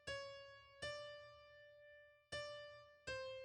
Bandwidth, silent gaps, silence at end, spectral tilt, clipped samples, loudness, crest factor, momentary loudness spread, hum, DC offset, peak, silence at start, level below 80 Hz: 11.5 kHz; none; 0 s; -2.5 dB/octave; under 0.1%; -52 LUFS; 18 dB; 14 LU; none; under 0.1%; -36 dBFS; 0 s; -74 dBFS